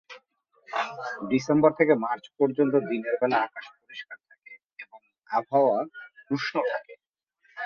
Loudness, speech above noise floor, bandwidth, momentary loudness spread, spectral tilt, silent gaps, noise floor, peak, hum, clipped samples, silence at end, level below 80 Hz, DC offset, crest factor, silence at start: -26 LUFS; 46 dB; 7.4 kHz; 23 LU; -6.5 dB/octave; 7.09-7.14 s; -71 dBFS; -6 dBFS; none; under 0.1%; 0 s; -70 dBFS; under 0.1%; 22 dB; 0.1 s